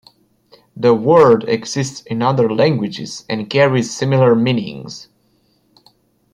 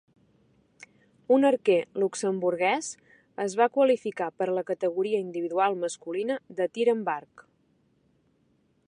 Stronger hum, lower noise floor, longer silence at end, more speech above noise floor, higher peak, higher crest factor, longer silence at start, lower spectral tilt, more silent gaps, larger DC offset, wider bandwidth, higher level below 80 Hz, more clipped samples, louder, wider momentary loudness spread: neither; second, -59 dBFS vs -68 dBFS; second, 1.3 s vs 1.65 s; about the same, 44 dB vs 42 dB; first, -2 dBFS vs -10 dBFS; about the same, 14 dB vs 18 dB; second, 0.75 s vs 1.3 s; first, -6 dB/octave vs -4.5 dB/octave; neither; neither; about the same, 11 kHz vs 11 kHz; first, -58 dBFS vs -80 dBFS; neither; first, -15 LUFS vs -27 LUFS; first, 15 LU vs 10 LU